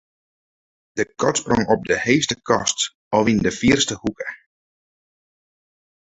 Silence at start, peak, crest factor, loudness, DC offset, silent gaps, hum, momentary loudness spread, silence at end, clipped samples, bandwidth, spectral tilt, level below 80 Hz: 0.95 s; -2 dBFS; 20 dB; -20 LUFS; under 0.1%; 2.94-3.11 s; none; 9 LU; 1.75 s; under 0.1%; 8.2 kHz; -3.5 dB/octave; -48 dBFS